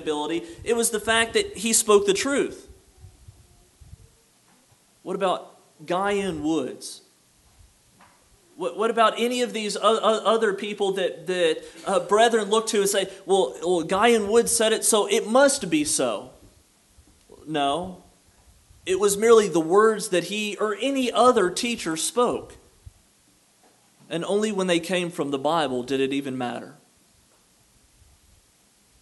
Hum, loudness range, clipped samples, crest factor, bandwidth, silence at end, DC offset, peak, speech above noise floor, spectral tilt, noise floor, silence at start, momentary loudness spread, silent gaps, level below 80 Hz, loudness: none; 9 LU; under 0.1%; 22 dB; 12 kHz; 2.3 s; under 0.1%; -4 dBFS; 38 dB; -3 dB/octave; -60 dBFS; 0 s; 12 LU; none; -58 dBFS; -23 LUFS